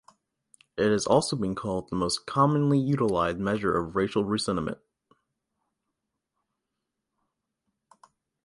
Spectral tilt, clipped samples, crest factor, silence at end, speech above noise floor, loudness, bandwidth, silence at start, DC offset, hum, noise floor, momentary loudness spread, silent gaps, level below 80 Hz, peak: -5.5 dB/octave; under 0.1%; 22 dB; 3.7 s; 58 dB; -26 LUFS; 11.5 kHz; 0.75 s; under 0.1%; none; -84 dBFS; 8 LU; none; -56 dBFS; -8 dBFS